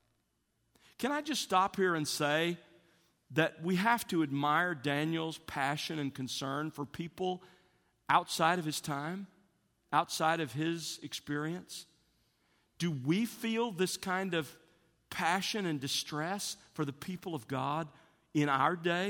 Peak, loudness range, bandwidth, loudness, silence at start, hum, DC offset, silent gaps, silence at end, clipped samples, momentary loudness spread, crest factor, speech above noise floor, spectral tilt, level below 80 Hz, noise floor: -12 dBFS; 4 LU; 18 kHz; -34 LUFS; 1 s; none; under 0.1%; none; 0 s; under 0.1%; 11 LU; 22 dB; 45 dB; -4.5 dB/octave; -74 dBFS; -78 dBFS